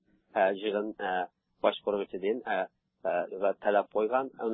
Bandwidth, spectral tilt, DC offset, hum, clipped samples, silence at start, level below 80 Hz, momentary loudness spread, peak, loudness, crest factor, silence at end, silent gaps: 4 kHz; -2.5 dB/octave; under 0.1%; none; under 0.1%; 0.35 s; -76 dBFS; 6 LU; -10 dBFS; -31 LUFS; 20 dB; 0 s; none